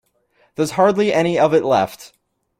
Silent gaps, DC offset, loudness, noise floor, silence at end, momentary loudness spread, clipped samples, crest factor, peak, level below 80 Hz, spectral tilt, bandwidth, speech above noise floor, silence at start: none; under 0.1%; -17 LUFS; -60 dBFS; 0.55 s; 10 LU; under 0.1%; 16 dB; -2 dBFS; -58 dBFS; -5.5 dB/octave; 16 kHz; 44 dB; 0.6 s